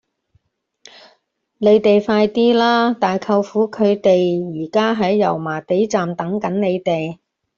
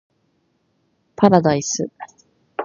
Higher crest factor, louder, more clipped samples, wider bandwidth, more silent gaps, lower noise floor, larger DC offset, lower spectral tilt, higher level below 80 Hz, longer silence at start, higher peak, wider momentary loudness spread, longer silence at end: second, 14 dB vs 20 dB; about the same, -17 LUFS vs -17 LUFS; neither; about the same, 7.2 kHz vs 7.4 kHz; neither; about the same, -63 dBFS vs -66 dBFS; neither; about the same, -6.5 dB/octave vs -5.5 dB/octave; about the same, -60 dBFS vs -58 dBFS; first, 1.6 s vs 1.2 s; about the same, -2 dBFS vs 0 dBFS; second, 8 LU vs 24 LU; first, 0.45 s vs 0 s